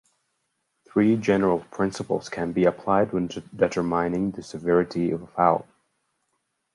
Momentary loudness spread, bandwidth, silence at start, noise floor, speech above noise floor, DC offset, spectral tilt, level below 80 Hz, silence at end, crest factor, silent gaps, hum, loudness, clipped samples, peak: 7 LU; 11.5 kHz; 0.95 s; -76 dBFS; 52 dB; under 0.1%; -7 dB/octave; -56 dBFS; 1.15 s; 22 dB; none; none; -24 LUFS; under 0.1%; -4 dBFS